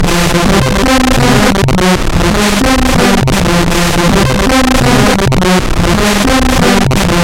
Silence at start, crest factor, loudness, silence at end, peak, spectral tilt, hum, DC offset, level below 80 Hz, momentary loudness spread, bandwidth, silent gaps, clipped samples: 0 s; 8 dB; -9 LUFS; 0 s; 0 dBFS; -4.5 dB/octave; none; 0.7%; -16 dBFS; 2 LU; 17.5 kHz; none; under 0.1%